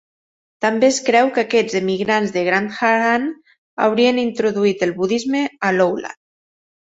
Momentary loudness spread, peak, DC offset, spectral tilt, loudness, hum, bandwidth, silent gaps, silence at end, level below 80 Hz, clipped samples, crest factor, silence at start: 6 LU; -2 dBFS; under 0.1%; -4.5 dB/octave; -18 LUFS; none; 8.2 kHz; 3.58-3.77 s; 0.8 s; -62 dBFS; under 0.1%; 16 dB; 0.6 s